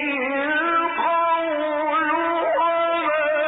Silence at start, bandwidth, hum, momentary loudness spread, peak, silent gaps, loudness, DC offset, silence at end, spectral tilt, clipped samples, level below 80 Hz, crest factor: 0 s; 4 kHz; none; 3 LU; -12 dBFS; none; -21 LUFS; under 0.1%; 0 s; 0 dB/octave; under 0.1%; -62 dBFS; 10 dB